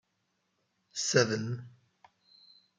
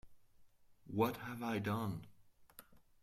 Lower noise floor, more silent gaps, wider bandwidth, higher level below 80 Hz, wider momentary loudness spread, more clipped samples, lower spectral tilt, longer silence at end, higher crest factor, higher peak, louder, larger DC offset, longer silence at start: first, -79 dBFS vs -66 dBFS; neither; second, 10 kHz vs 16 kHz; second, -78 dBFS vs -70 dBFS; second, 15 LU vs 23 LU; neither; second, -3.5 dB/octave vs -6.5 dB/octave; first, 1.1 s vs 0.25 s; about the same, 26 dB vs 22 dB; first, -10 dBFS vs -20 dBFS; first, -30 LUFS vs -40 LUFS; neither; first, 0.95 s vs 0.05 s